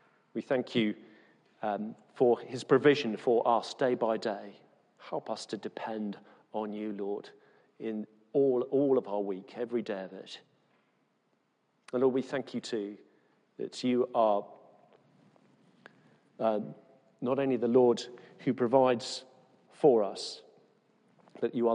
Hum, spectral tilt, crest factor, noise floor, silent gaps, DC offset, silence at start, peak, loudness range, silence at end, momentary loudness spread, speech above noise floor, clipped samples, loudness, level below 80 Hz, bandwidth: none; -6 dB/octave; 20 dB; -75 dBFS; none; under 0.1%; 0.35 s; -12 dBFS; 8 LU; 0 s; 16 LU; 45 dB; under 0.1%; -31 LUFS; -84 dBFS; 10 kHz